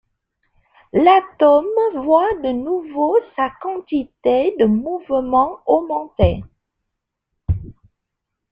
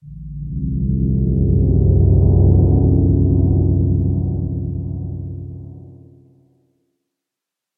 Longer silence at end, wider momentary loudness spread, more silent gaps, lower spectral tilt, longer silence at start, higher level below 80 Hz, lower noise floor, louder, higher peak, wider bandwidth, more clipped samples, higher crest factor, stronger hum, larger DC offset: second, 0.8 s vs 1.85 s; second, 11 LU vs 17 LU; neither; second, -9.5 dB/octave vs -17 dB/octave; first, 0.95 s vs 0.05 s; second, -38 dBFS vs -24 dBFS; second, -79 dBFS vs -84 dBFS; about the same, -18 LUFS vs -16 LUFS; about the same, -2 dBFS vs -2 dBFS; first, 5.2 kHz vs 1.1 kHz; neither; about the same, 18 dB vs 14 dB; neither; neither